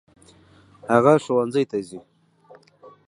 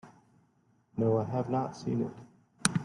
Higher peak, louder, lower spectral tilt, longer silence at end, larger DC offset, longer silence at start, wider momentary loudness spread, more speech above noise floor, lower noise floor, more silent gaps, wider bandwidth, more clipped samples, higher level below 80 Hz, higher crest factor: about the same, -2 dBFS vs -2 dBFS; first, -20 LUFS vs -32 LUFS; first, -7 dB/octave vs -5 dB/octave; first, 1.1 s vs 0 s; neither; first, 0.85 s vs 0.05 s; first, 23 LU vs 11 LU; second, 33 dB vs 38 dB; second, -53 dBFS vs -69 dBFS; neither; about the same, 11.5 kHz vs 11.5 kHz; neither; about the same, -66 dBFS vs -68 dBFS; second, 22 dB vs 32 dB